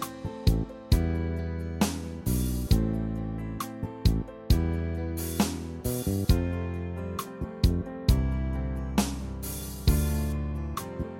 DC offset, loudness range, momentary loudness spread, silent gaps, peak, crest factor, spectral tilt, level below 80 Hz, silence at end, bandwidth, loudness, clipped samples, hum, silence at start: under 0.1%; 1 LU; 9 LU; none; -8 dBFS; 20 dB; -6 dB/octave; -32 dBFS; 0 s; 16.5 kHz; -30 LUFS; under 0.1%; none; 0 s